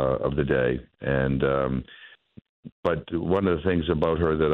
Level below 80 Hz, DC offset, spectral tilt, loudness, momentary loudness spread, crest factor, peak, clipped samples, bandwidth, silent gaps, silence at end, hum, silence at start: -42 dBFS; under 0.1%; -9.5 dB/octave; -25 LUFS; 6 LU; 16 dB; -10 dBFS; under 0.1%; 4.8 kHz; 2.49-2.63 s, 2.72-2.83 s; 0 s; none; 0 s